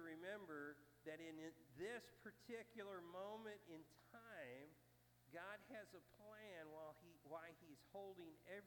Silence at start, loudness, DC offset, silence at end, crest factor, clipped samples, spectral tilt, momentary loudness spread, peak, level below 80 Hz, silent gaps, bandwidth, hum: 0 s; -58 LUFS; under 0.1%; 0 s; 18 dB; under 0.1%; -5 dB/octave; 10 LU; -40 dBFS; -88 dBFS; none; 19 kHz; 60 Hz at -80 dBFS